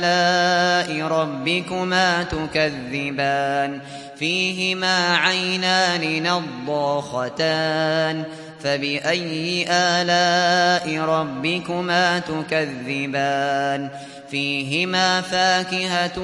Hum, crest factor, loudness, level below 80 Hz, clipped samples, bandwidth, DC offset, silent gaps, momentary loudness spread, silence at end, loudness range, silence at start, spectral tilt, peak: none; 18 dB; -20 LUFS; -54 dBFS; under 0.1%; 11.5 kHz; under 0.1%; none; 8 LU; 0 s; 3 LU; 0 s; -3.5 dB/octave; -2 dBFS